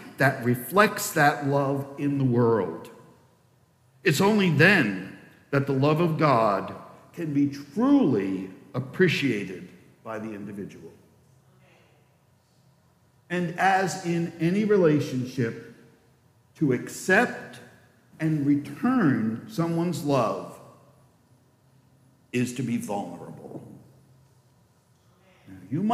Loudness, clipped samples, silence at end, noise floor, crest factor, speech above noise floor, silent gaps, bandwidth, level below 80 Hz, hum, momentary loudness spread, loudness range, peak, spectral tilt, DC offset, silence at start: -24 LUFS; under 0.1%; 0 s; -63 dBFS; 22 dB; 39 dB; none; 15.5 kHz; -70 dBFS; none; 17 LU; 11 LU; -6 dBFS; -6 dB/octave; under 0.1%; 0 s